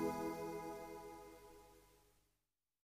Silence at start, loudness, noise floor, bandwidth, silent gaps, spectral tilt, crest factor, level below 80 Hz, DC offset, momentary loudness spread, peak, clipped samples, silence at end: 0 s; -48 LUFS; under -90 dBFS; 15.5 kHz; none; -5.5 dB/octave; 20 dB; -72 dBFS; under 0.1%; 20 LU; -30 dBFS; under 0.1%; 0.9 s